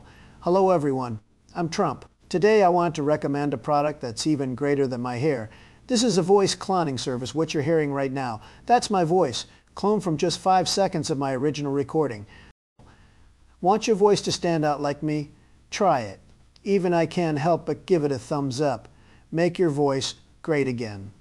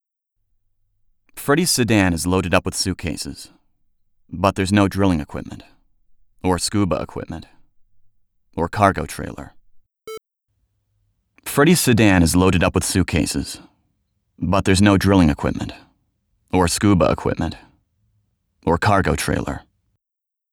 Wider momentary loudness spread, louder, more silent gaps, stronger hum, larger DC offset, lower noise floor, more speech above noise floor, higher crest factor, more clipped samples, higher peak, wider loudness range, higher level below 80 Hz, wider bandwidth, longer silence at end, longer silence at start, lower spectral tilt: second, 12 LU vs 19 LU; second, -24 LUFS vs -18 LUFS; first, 12.51-12.76 s vs none; neither; neither; second, -54 dBFS vs -84 dBFS; second, 31 dB vs 66 dB; about the same, 18 dB vs 20 dB; neither; second, -6 dBFS vs 0 dBFS; second, 2 LU vs 8 LU; second, -56 dBFS vs -38 dBFS; second, 12 kHz vs over 20 kHz; second, 0.1 s vs 0.9 s; second, 0.4 s vs 1.35 s; about the same, -5.5 dB/octave vs -5 dB/octave